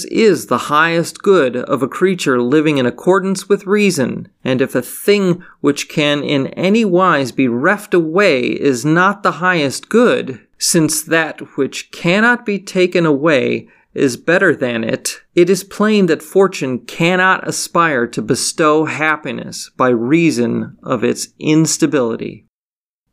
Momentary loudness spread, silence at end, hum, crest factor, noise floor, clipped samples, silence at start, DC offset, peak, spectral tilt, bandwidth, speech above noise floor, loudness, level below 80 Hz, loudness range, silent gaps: 8 LU; 0.75 s; none; 14 dB; under -90 dBFS; under 0.1%; 0 s; under 0.1%; 0 dBFS; -4.5 dB/octave; 16 kHz; over 76 dB; -15 LUFS; -60 dBFS; 2 LU; none